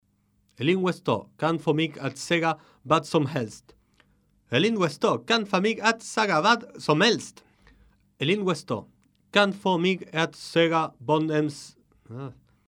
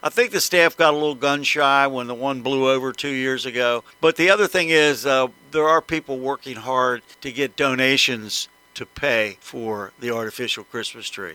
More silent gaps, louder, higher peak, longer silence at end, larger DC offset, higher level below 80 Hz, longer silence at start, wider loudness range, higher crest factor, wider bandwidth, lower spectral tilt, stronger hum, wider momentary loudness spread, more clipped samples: neither; second, -25 LUFS vs -20 LUFS; second, -6 dBFS vs 0 dBFS; first, 0.35 s vs 0 s; neither; second, -68 dBFS vs -60 dBFS; first, 0.6 s vs 0.05 s; about the same, 3 LU vs 3 LU; about the same, 20 dB vs 20 dB; second, 15 kHz vs 19 kHz; first, -5 dB/octave vs -3 dB/octave; neither; about the same, 12 LU vs 13 LU; neither